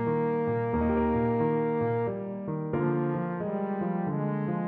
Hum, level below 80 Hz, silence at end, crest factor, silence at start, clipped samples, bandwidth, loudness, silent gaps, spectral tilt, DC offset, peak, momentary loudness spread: none; -48 dBFS; 0 s; 12 dB; 0 s; under 0.1%; 4.2 kHz; -29 LUFS; none; -9 dB/octave; under 0.1%; -16 dBFS; 5 LU